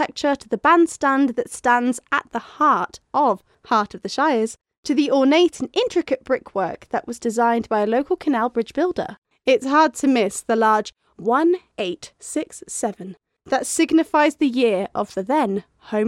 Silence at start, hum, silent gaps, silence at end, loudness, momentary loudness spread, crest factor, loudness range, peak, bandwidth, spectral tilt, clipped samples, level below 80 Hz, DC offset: 0 s; none; 4.77-4.83 s, 9.18-9.22 s; 0 s; -20 LUFS; 11 LU; 16 dB; 3 LU; -4 dBFS; 14.5 kHz; -4 dB/octave; under 0.1%; -60 dBFS; under 0.1%